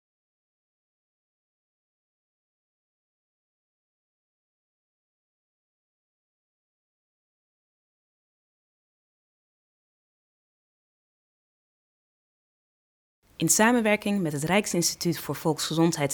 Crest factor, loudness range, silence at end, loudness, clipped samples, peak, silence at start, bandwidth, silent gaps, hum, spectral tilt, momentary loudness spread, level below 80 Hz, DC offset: 24 dB; 4 LU; 0 s; -24 LUFS; under 0.1%; -8 dBFS; 13.4 s; 19.5 kHz; none; none; -4 dB/octave; 9 LU; -66 dBFS; under 0.1%